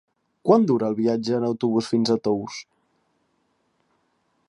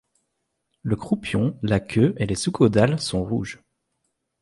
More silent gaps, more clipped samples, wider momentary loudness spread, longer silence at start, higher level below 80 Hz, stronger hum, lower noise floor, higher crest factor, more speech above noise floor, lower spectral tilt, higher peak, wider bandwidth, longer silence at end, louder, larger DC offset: neither; neither; about the same, 10 LU vs 10 LU; second, 0.45 s vs 0.85 s; second, -68 dBFS vs -46 dBFS; neither; second, -69 dBFS vs -76 dBFS; about the same, 20 dB vs 20 dB; second, 48 dB vs 55 dB; about the same, -6.5 dB/octave vs -6 dB/octave; about the same, -4 dBFS vs -4 dBFS; about the same, 10.5 kHz vs 11.5 kHz; first, 1.85 s vs 0.85 s; about the same, -22 LUFS vs -22 LUFS; neither